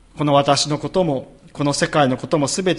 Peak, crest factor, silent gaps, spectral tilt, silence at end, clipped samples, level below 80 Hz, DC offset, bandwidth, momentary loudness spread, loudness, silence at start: -2 dBFS; 18 dB; none; -4.5 dB/octave; 0 s; under 0.1%; -50 dBFS; under 0.1%; 11.5 kHz; 8 LU; -19 LUFS; 0.15 s